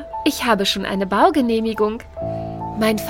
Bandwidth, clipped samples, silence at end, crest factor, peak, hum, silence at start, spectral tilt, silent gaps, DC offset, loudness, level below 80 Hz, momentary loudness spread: 17 kHz; under 0.1%; 0 s; 18 dB; 0 dBFS; none; 0 s; -4.5 dB/octave; none; under 0.1%; -20 LUFS; -44 dBFS; 12 LU